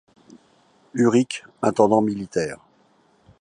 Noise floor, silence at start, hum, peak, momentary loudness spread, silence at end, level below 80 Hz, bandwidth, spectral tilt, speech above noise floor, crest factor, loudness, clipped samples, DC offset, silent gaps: -60 dBFS; 0.95 s; none; -2 dBFS; 13 LU; 0.85 s; -60 dBFS; 10.5 kHz; -6 dB/octave; 39 dB; 20 dB; -21 LUFS; under 0.1%; under 0.1%; none